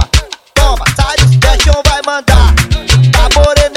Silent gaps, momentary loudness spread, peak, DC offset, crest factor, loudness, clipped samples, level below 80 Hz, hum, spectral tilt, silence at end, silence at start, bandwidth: none; 5 LU; 0 dBFS; under 0.1%; 8 dB; -9 LUFS; 0.6%; -12 dBFS; none; -4 dB/octave; 0 s; 0 s; 16 kHz